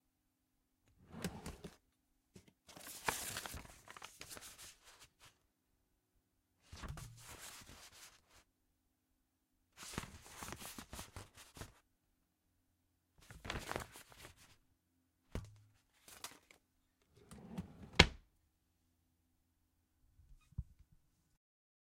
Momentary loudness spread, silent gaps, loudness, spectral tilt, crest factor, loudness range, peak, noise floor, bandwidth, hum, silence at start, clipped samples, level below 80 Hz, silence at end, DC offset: 19 LU; none; -42 LUFS; -3 dB/octave; 46 dB; 18 LU; -2 dBFS; -83 dBFS; 16 kHz; none; 1 s; under 0.1%; -58 dBFS; 1.25 s; under 0.1%